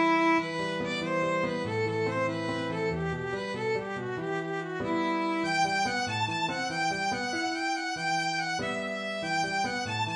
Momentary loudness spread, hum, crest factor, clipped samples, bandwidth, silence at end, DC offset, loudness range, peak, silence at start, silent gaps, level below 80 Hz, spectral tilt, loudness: 6 LU; none; 14 dB; under 0.1%; 11 kHz; 0 s; under 0.1%; 2 LU; -14 dBFS; 0 s; none; -60 dBFS; -4.5 dB/octave; -30 LUFS